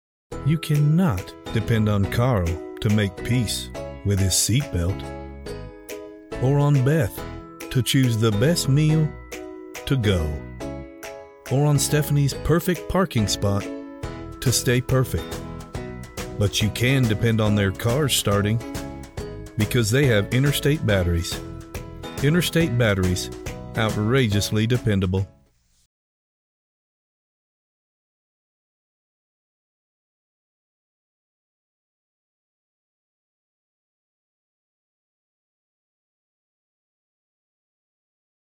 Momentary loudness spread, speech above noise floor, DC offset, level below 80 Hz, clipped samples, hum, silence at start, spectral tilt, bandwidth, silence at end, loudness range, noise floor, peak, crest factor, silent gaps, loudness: 16 LU; 40 dB; under 0.1%; -42 dBFS; under 0.1%; none; 0.3 s; -5 dB/octave; 19 kHz; 13.35 s; 3 LU; -60 dBFS; -8 dBFS; 16 dB; none; -22 LUFS